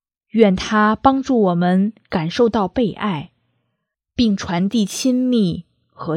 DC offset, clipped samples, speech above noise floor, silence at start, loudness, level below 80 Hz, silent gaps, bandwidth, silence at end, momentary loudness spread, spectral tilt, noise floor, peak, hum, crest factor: under 0.1%; under 0.1%; 59 dB; 0.35 s; -18 LUFS; -46 dBFS; none; 15 kHz; 0 s; 9 LU; -6 dB/octave; -75 dBFS; 0 dBFS; none; 18 dB